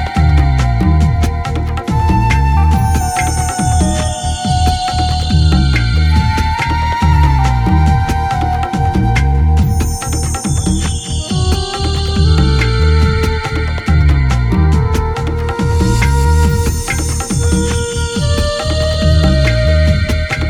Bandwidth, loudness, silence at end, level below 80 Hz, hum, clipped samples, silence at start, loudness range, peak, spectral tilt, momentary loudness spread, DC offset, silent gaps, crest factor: 15 kHz; -13 LUFS; 0 s; -16 dBFS; none; under 0.1%; 0 s; 2 LU; 0 dBFS; -5.5 dB/octave; 5 LU; under 0.1%; none; 12 dB